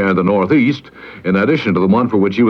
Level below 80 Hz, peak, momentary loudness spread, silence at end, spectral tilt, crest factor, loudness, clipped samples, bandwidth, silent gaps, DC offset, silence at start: -52 dBFS; -2 dBFS; 12 LU; 0 s; -8.5 dB/octave; 12 dB; -14 LUFS; under 0.1%; 6.4 kHz; none; under 0.1%; 0 s